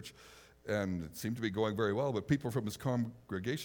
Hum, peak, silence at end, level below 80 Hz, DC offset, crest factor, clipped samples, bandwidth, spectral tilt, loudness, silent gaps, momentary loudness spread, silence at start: none; -18 dBFS; 0 s; -64 dBFS; under 0.1%; 18 dB; under 0.1%; over 20 kHz; -6 dB/octave; -36 LUFS; none; 7 LU; 0 s